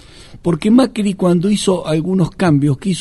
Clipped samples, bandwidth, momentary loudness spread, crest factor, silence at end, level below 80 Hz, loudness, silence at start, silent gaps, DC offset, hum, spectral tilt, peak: under 0.1%; 12 kHz; 5 LU; 14 dB; 0 s; -42 dBFS; -15 LUFS; 0.3 s; none; under 0.1%; none; -6.5 dB/octave; 0 dBFS